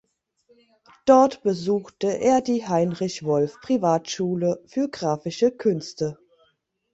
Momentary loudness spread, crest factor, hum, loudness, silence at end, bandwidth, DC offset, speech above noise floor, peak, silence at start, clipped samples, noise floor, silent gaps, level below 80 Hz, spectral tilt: 10 LU; 20 dB; none; -23 LUFS; 0.8 s; 8 kHz; under 0.1%; 45 dB; -4 dBFS; 1.05 s; under 0.1%; -68 dBFS; none; -64 dBFS; -6 dB/octave